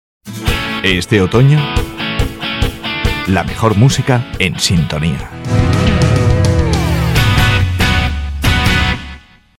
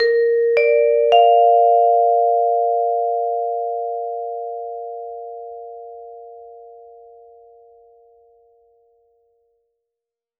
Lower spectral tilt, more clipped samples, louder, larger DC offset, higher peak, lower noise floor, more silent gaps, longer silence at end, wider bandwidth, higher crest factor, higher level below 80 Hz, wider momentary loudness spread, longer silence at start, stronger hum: first, -5.5 dB/octave vs -2.5 dB/octave; neither; first, -13 LUFS vs -17 LUFS; neither; about the same, 0 dBFS vs -2 dBFS; second, -34 dBFS vs -85 dBFS; neither; second, 0.4 s vs 3.7 s; first, 17 kHz vs 5.2 kHz; about the same, 14 dB vs 18 dB; first, -22 dBFS vs -70 dBFS; second, 7 LU vs 23 LU; first, 0.25 s vs 0 s; neither